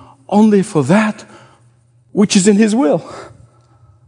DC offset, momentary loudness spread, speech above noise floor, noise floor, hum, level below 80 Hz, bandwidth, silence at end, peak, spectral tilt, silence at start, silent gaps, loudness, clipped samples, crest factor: under 0.1%; 17 LU; 39 dB; -51 dBFS; none; -60 dBFS; 10.5 kHz; 0.8 s; 0 dBFS; -5.5 dB/octave; 0.3 s; none; -13 LUFS; under 0.1%; 14 dB